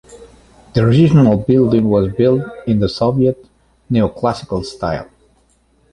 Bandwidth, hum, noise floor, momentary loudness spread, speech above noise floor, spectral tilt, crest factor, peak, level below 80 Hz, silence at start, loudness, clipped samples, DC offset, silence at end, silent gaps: 11 kHz; none; -56 dBFS; 12 LU; 42 dB; -8.5 dB/octave; 14 dB; -2 dBFS; -40 dBFS; 0.1 s; -15 LUFS; under 0.1%; under 0.1%; 0.9 s; none